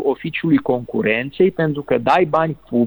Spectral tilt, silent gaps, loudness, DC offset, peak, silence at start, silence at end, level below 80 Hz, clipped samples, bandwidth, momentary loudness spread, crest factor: -8.5 dB/octave; none; -18 LUFS; under 0.1%; -2 dBFS; 0 s; 0 s; -52 dBFS; under 0.1%; over 20 kHz; 6 LU; 14 dB